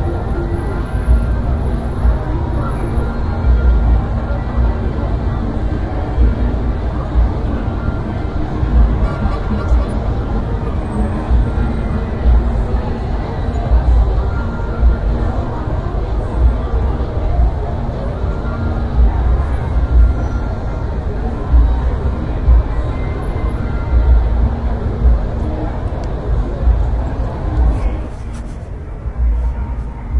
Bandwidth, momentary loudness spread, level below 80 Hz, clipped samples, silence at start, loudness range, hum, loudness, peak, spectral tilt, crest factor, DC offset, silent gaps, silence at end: 4.7 kHz; 7 LU; -16 dBFS; under 0.1%; 0 s; 2 LU; none; -18 LUFS; -2 dBFS; -9 dB/octave; 14 dB; under 0.1%; none; 0 s